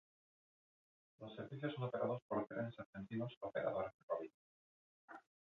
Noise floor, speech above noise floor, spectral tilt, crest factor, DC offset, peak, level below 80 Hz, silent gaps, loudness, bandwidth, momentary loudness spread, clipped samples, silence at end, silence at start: under -90 dBFS; over 46 dB; -6 dB/octave; 20 dB; under 0.1%; -26 dBFS; -80 dBFS; 2.22-2.29 s, 2.86-2.93 s, 3.37-3.41 s, 3.94-4.08 s, 4.34-5.08 s; -45 LUFS; 6.6 kHz; 17 LU; under 0.1%; 0.35 s; 1.2 s